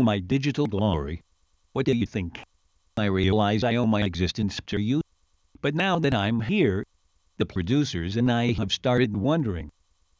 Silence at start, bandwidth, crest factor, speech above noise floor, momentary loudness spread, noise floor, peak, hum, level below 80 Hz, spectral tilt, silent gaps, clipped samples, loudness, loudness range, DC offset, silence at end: 0 s; 7.8 kHz; 18 dB; 42 dB; 12 LU; -66 dBFS; -8 dBFS; none; -42 dBFS; -6.5 dB/octave; none; under 0.1%; -25 LUFS; 2 LU; under 0.1%; 0.5 s